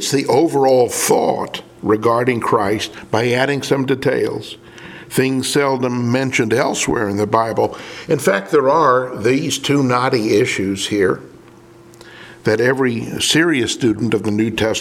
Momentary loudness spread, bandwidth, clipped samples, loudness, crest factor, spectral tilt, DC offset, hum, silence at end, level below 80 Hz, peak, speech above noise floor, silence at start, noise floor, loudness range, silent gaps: 8 LU; 17.5 kHz; under 0.1%; -16 LUFS; 16 dB; -4.5 dB/octave; under 0.1%; none; 0 s; -52 dBFS; 0 dBFS; 26 dB; 0 s; -43 dBFS; 3 LU; none